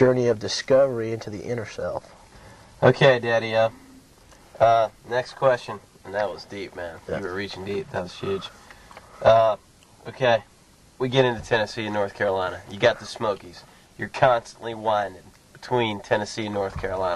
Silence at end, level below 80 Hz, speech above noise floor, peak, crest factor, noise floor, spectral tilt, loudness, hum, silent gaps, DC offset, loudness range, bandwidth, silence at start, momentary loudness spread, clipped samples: 0 s; -54 dBFS; 31 dB; -4 dBFS; 20 dB; -54 dBFS; -5.5 dB/octave; -24 LUFS; none; none; under 0.1%; 6 LU; 12.5 kHz; 0 s; 15 LU; under 0.1%